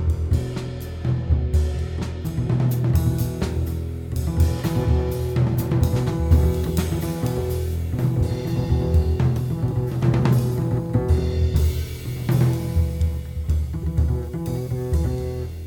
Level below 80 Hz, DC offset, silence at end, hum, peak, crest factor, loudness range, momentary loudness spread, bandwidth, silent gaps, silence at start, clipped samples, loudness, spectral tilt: -26 dBFS; under 0.1%; 0 s; none; -4 dBFS; 16 dB; 2 LU; 7 LU; 18.5 kHz; none; 0 s; under 0.1%; -23 LUFS; -7.5 dB/octave